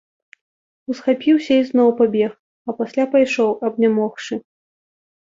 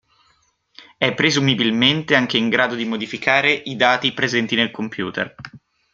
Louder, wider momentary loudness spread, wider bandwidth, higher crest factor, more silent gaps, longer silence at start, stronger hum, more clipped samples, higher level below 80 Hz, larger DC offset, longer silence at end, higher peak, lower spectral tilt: about the same, -18 LUFS vs -18 LUFS; first, 14 LU vs 10 LU; about the same, 7.6 kHz vs 7.8 kHz; about the same, 16 dB vs 18 dB; first, 2.39-2.65 s vs none; about the same, 0.9 s vs 0.8 s; neither; neither; second, -66 dBFS vs -60 dBFS; neither; first, 0.9 s vs 0.35 s; about the same, -4 dBFS vs -2 dBFS; first, -6 dB/octave vs -4 dB/octave